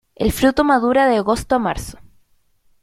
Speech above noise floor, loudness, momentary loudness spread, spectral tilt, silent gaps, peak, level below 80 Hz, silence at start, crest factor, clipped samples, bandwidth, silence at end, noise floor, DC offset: 41 dB; -17 LUFS; 10 LU; -5 dB/octave; none; -2 dBFS; -36 dBFS; 0.2 s; 16 dB; under 0.1%; 16 kHz; 0.9 s; -58 dBFS; under 0.1%